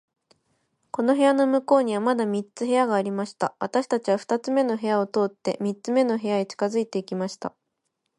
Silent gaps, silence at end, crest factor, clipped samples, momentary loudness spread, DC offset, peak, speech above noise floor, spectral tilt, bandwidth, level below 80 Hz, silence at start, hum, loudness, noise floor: none; 0.7 s; 16 dB; under 0.1%; 9 LU; under 0.1%; -8 dBFS; 55 dB; -5.5 dB/octave; 11.5 kHz; -76 dBFS; 0.95 s; none; -24 LUFS; -78 dBFS